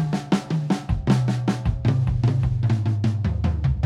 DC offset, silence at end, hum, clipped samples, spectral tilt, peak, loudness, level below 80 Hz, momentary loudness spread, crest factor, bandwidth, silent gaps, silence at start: under 0.1%; 0 s; none; under 0.1%; -8 dB/octave; -4 dBFS; -23 LUFS; -32 dBFS; 3 LU; 16 dB; 10.5 kHz; none; 0 s